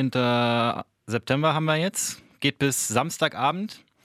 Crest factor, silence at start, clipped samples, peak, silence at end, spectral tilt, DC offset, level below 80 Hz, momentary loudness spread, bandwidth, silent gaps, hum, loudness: 20 dB; 0 s; under 0.1%; -4 dBFS; 0.25 s; -4 dB/octave; under 0.1%; -64 dBFS; 9 LU; 15.5 kHz; none; none; -24 LUFS